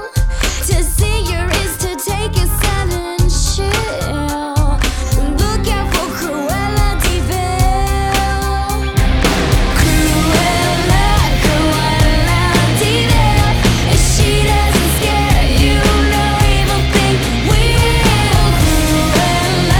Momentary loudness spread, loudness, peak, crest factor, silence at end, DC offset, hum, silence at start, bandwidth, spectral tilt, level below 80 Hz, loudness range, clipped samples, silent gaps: 5 LU; -14 LUFS; -2 dBFS; 10 dB; 0 s; under 0.1%; none; 0 s; 19.5 kHz; -4.5 dB/octave; -16 dBFS; 4 LU; under 0.1%; none